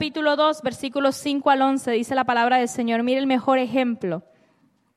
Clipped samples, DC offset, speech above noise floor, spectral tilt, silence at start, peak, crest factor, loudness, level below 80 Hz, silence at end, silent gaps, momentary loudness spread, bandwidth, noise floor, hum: under 0.1%; under 0.1%; 42 dB; -4 dB/octave; 0 s; -6 dBFS; 16 dB; -21 LUFS; -68 dBFS; 0.75 s; none; 8 LU; 13.5 kHz; -63 dBFS; none